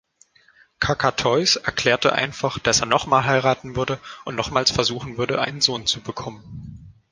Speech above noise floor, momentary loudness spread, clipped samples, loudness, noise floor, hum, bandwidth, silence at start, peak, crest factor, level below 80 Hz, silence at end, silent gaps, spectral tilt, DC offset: 35 dB; 14 LU; under 0.1%; -20 LUFS; -57 dBFS; none; 11 kHz; 0.8 s; 0 dBFS; 22 dB; -48 dBFS; 0.2 s; none; -3 dB/octave; under 0.1%